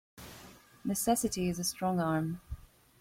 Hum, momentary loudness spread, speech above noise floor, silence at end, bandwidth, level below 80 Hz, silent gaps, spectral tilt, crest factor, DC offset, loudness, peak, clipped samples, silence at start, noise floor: none; 19 LU; 23 dB; 0.45 s; 16.5 kHz; -56 dBFS; none; -4.5 dB/octave; 18 dB; under 0.1%; -32 LUFS; -16 dBFS; under 0.1%; 0.15 s; -55 dBFS